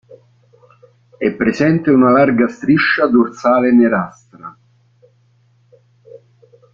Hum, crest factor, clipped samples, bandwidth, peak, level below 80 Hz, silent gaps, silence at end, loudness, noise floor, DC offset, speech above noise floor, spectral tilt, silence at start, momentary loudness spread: none; 14 dB; under 0.1%; 7.2 kHz; -2 dBFS; -54 dBFS; none; 2.25 s; -13 LUFS; -55 dBFS; under 0.1%; 42 dB; -7.5 dB/octave; 0.1 s; 21 LU